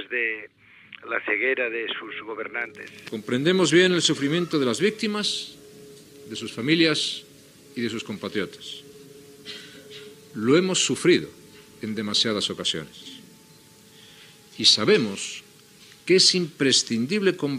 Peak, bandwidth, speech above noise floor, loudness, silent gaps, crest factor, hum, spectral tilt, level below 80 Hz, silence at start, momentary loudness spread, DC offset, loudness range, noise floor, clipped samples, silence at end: -4 dBFS; 15.5 kHz; 28 dB; -22 LUFS; none; 20 dB; none; -3.5 dB/octave; -72 dBFS; 0 s; 21 LU; under 0.1%; 7 LU; -52 dBFS; under 0.1%; 0 s